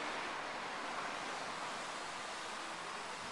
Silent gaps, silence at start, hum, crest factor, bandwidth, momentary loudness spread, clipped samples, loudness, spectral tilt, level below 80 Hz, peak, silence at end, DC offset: none; 0 s; none; 14 dB; 11.5 kHz; 2 LU; under 0.1%; -42 LUFS; -1.5 dB/octave; -76 dBFS; -30 dBFS; 0 s; under 0.1%